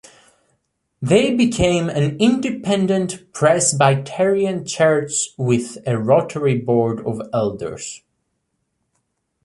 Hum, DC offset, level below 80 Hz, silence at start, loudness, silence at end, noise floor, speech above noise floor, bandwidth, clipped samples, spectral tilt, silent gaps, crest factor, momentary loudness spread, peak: none; under 0.1%; -48 dBFS; 1 s; -18 LUFS; 1.5 s; -72 dBFS; 54 dB; 11.5 kHz; under 0.1%; -5 dB/octave; none; 16 dB; 10 LU; -2 dBFS